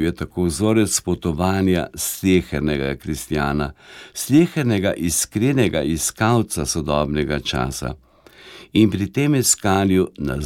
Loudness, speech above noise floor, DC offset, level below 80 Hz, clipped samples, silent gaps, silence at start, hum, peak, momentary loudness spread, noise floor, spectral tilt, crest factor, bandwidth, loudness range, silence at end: -20 LUFS; 25 dB; under 0.1%; -38 dBFS; under 0.1%; none; 0 s; none; -2 dBFS; 8 LU; -44 dBFS; -5 dB/octave; 18 dB; 17 kHz; 2 LU; 0 s